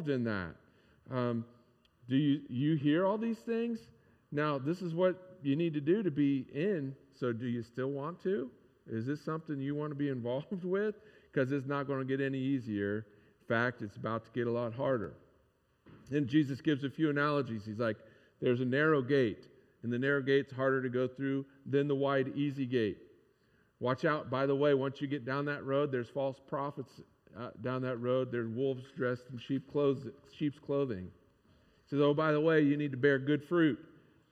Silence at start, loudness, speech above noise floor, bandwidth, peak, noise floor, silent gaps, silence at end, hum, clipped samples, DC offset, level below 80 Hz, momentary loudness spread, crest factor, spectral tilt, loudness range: 0 s; -34 LUFS; 39 dB; 8 kHz; -14 dBFS; -72 dBFS; none; 0.45 s; none; under 0.1%; under 0.1%; -76 dBFS; 10 LU; 20 dB; -8.5 dB/octave; 5 LU